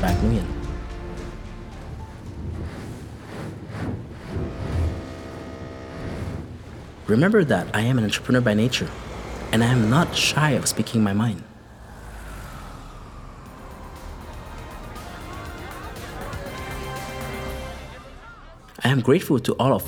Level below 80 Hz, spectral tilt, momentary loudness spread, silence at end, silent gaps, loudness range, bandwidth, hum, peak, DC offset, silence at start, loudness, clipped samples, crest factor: -38 dBFS; -5.5 dB/octave; 21 LU; 0 s; none; 17 LU; 18.5 kHz; none; -4 dBFS; under 0.1%; 0 s; -24 LUFS; under 0.1%; 20 dB